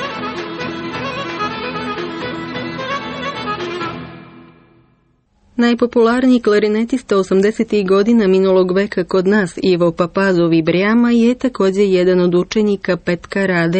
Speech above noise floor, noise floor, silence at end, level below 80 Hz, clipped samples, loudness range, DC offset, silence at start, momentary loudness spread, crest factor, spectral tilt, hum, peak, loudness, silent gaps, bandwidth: 44 dB; -58 dBFS; 0 s; -48 dBFS; under 0.1%; 10 LU; under 0.1%; 0 s; 11 LU; 12 dB; -6.5 dB/octave; none; -4 dBFS; -16 LUFS; none; 8.8 kHz